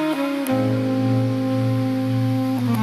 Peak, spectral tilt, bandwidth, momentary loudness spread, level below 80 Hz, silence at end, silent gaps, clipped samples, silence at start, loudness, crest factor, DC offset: -8 dBFS; -7.5 dB/octave; 14.5 kHz; 1 LU; -56 dBFS; 0 s; none; under 0.1%; 0 s; -21 LUFS; 14 dB; under 0.1%